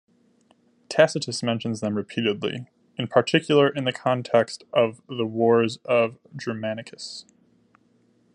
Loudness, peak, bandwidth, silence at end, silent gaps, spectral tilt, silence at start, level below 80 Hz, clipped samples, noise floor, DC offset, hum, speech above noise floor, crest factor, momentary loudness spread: -24 LUFS; -2 dBFS; 11 kHz; 1.15 s; none; -5 dB/octave; 0.9 s; -72 dBFS; under 0.1%; -63 dBFS; under 0.1%; none; 39 dB; 24 dB; 14 LU